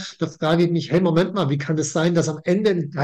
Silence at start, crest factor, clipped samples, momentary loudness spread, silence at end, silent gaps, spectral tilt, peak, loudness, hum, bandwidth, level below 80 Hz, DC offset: 0 s; 12 dB; under 0.1%; 4 LU; 0 s; none; -6 dB/octave; -8 dBFS; -21 LUFS; none; 9 kHz; -58 dBFS; under 0.1%